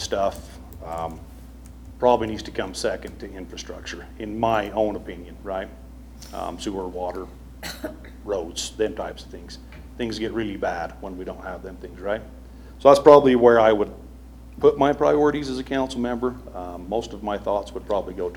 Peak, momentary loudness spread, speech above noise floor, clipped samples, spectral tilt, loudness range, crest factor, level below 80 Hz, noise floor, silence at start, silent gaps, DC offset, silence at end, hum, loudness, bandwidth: 0 dBFS; 22 LU; 19 dB; under 0.1%; -5 dB/octave; 13 LU; 24 dB; -42 dBFS; -42 dBFS; 0 s; none; under 0.1%; 0 s; none; -22 LUFS; 19 kHz